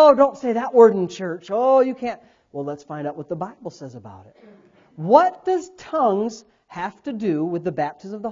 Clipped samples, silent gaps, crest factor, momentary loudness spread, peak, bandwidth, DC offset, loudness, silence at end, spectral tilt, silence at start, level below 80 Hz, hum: under 0.1%; none; 20 dB; 21 LU; 0 dBFS; 7.6 kHz; under 0.1%; -21 LUFS; 0 s; -6.5 dB/octave; 0 s; -64 dBFS; none